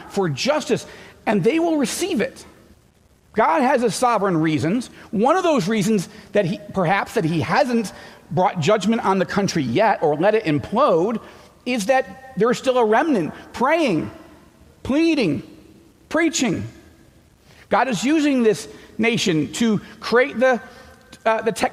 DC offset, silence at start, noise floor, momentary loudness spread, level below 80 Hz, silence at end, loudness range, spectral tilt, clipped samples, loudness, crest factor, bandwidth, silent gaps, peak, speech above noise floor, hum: under 0.1%; 0 s; -55 dBFS; 8 LU; -54 dBFS; 0 s; 3 LU; -5 dB/octave; under 0.1%; -20 LUFS; 14 dB; 16 kHz; none; -6 dBFS; 36 dB; none